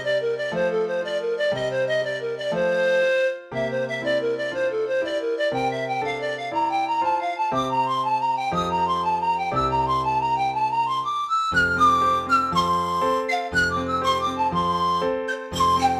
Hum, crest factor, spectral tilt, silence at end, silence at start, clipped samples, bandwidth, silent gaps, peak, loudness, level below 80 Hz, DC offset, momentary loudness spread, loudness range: none; 14 dB; -4.5 dB/octave; 0 s; 0 s; under 0.1%; 14.5 kHz; none; -8 dBFS; -23 LUFS; -50 dBFS; under 0.1%; 6 LU; 3 LU